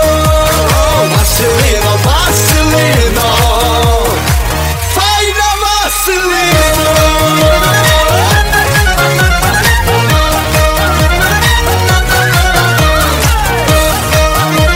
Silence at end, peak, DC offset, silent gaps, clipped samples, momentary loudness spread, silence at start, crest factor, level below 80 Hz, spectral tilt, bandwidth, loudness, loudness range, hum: 0 s; 0 dBFS; 0.3%; none; under 0.1%; 2 LU; 0 s; 8 dB; -16 dBFS; -3.5 dB/octave; 16.5 kHz; -9 LUFS; 2 LU; none